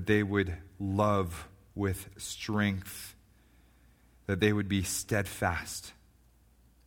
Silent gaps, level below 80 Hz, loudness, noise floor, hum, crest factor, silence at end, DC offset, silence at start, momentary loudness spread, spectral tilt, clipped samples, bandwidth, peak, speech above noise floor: none; -54 dBFS; -32 LUFS; -63 dBFS; none; 22 dB; 0.95 s; under 0.1%; 0 s; 16 LU; -5 dB/octave; under 0.1%; 18 kHz; -12 dBFS; 32 dB